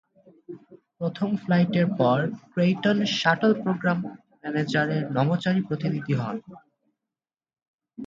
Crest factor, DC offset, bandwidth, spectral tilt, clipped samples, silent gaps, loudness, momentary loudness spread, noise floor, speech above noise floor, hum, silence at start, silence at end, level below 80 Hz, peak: 20 dB; under 0.1%; 7.6 kHz; -7 dB/octave; under 0.1%; 7.68-7.79 s; -24 LUFS; 15 LU; under -90 dBFS; over 66 dB; none; 0.5 s; 0 s; -66 dBFS; -4 dBFS